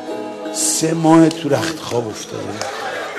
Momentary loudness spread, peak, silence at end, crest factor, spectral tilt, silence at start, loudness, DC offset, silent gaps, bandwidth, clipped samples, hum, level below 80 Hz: 15 LU; 0 dBFS; 0 s; 18 dB; -4 dB/octave; 0 s; -18 LUFS; under 0.1%; none; 13.5 kHz; under 0.1%; none; -58 dBFS